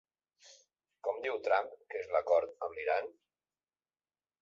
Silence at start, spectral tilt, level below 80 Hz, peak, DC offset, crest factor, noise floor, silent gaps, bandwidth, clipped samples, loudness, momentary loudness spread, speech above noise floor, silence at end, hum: 0.45 s; -3 dB/octave; -76 dBFS; -18 dBFS; under 0.1%; 20 dB; under -90 dBFS; none; 7.4 kHz; under 0.1%; -34 LUFS; 12 LU; over 56 dB; 1.3 s; none